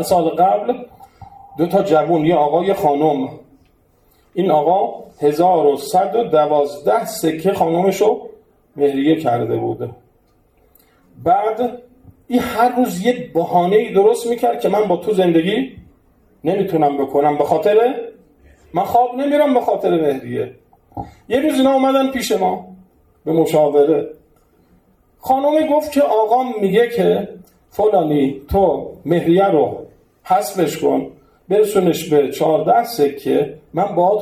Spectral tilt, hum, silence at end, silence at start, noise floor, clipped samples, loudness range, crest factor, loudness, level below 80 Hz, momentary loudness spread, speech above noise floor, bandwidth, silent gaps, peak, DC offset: -6 dB/octave; none; 0 s; 0 s; -56 dBFS; under 0.1%; 3 LU; 16 dB; -16 LUFS; -48 dBFS; 10 LU; 41 dB; 15.5 kHz; none; -2 dBFS; under 0.1%